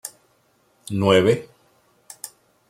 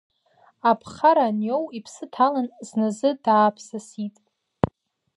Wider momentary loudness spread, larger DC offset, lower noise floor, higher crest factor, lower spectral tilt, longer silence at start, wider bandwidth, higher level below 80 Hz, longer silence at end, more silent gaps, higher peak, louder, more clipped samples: first, 22 LU vs 16 LU; neither; about the same, -62 dBFS vs -60 dBFS; about the same, 22 dB vs 22 dB; about the same, -5.5 dB/octave vs -6 dB/octave; second, 0.05 s vs 0.65 s; first, 16.5 kHz vs 11.5 kHz; second, -62 dBFS vs -54 dBFS; about the same, 0.4 s vs 0.5 s; neither; about the same, -2 dBFS vs 0 dBFS; first, -19 LUFS vs -22 LUFS; neither